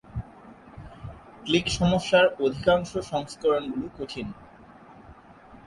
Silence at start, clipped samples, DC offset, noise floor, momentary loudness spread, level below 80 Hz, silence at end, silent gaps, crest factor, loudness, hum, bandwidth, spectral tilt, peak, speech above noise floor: 0.1 s; under 0.1%; under 0.1%; -50 dBFS; 23 LU; -48 dBFS; 0.1 s; none; 18 dB; -25 LUFS; none; 11.5 kHz; -5 dB/octave; -8 dBFS; 25 dB